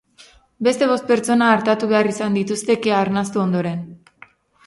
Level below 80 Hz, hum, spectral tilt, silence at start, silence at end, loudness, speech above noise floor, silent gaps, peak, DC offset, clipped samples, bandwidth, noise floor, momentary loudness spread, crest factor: -60 dBFS; none; -5.5 dB/octave; 0.6 s; 0.7 s; -18 LUFS; 32 dB; none; -2 dBFS; under 0.1%; under 0.1%; 11.5 kHz; -50 dBFS; 7 LU; 18 dB